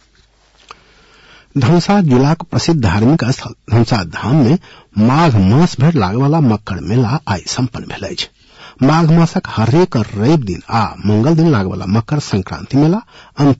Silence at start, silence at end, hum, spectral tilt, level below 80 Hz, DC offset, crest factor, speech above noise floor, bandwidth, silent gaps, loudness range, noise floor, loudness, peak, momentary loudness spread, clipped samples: 1.55 s; 0.05 s; none; -7 dB/octave; -42 dBFS; under 0.1%; 10 dB; 39 dB; 8 kHz; none; 2 LU; -52 dBFS; -14 LUFS; -4 dBFS; 9 LU; under 0.1%